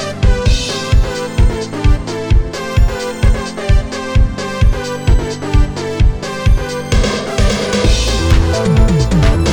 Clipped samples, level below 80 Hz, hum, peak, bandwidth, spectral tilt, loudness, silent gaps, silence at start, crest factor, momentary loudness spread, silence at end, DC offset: under 0.1%; -14 dBFS; none; 0 dBFS; 12 kHz; -5.5 dB/octave; -15 LUFS; none; 0 s; 12 dB; 5 LU; 0 s; under 0.1%